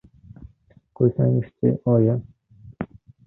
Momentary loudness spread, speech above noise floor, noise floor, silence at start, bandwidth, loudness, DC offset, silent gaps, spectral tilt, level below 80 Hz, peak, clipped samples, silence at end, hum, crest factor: 16 LU; 37 dB; -56 dBFS; 0.4 s; 2.8 kHz; -21 LUFS; under 0.1%; none; -14 dB/octave; -52 dBFS; -6 dBFS; under 0.1%; 0.4 s; none; 18 dB